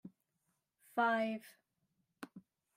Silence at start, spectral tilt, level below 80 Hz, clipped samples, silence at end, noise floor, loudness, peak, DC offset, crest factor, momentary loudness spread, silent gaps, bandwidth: 0.05 s; -5 dB/octave; under -90 dBFS; under 0.1%; 0.35 s; -84 dBFS; -37 LUFS; -20 dBFS; under 0.1%; 20 dB; 21 LU; none; 16 kHz